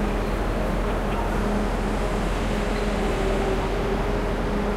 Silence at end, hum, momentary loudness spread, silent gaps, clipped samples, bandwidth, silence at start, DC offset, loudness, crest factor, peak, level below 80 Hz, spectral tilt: 0 s; none; 2 LU; none; under 0.1%; 13.5 kHz; 0 s; under 0.1%; -25 LUFS; 12 dB; -12 dBFS; -28 dBFS; -6 dB/octave